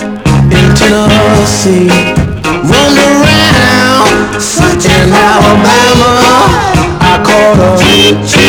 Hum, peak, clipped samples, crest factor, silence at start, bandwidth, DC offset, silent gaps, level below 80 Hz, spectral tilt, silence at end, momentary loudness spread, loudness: none; 0 dBFS; 5%; 6 dB; 0 s; over 20 kHz; under 0.1%; none; -22 dBFS; -4.5 dB/octave; 0 s; 4 LU; -5 LUFS